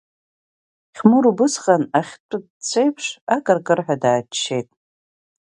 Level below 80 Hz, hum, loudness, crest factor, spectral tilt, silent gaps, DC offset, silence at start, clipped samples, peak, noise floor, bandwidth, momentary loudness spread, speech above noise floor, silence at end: -68 dBFS; none; -19 LUFS; 20 dB; -4.5 dB/octave; 2.20-2.29 s, 2.50-2.60 s, 3.21-3.27 s; under 0.1%; 0.95 s; under 0.1%; 0 dBFS; under -90 dBFS; 11 kHz; 12 LU; over 72 dB; 0.85 s